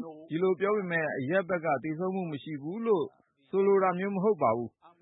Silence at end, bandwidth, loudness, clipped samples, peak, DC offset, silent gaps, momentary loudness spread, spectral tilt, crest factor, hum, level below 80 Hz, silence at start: 0.15 s; 4 kHz; -29 LUFS; under 0.1%; -14 dBFS; under 0.1%; none; 11 LU; -11 dB/octave; 16 dB; none; -76 dBFS; 0 s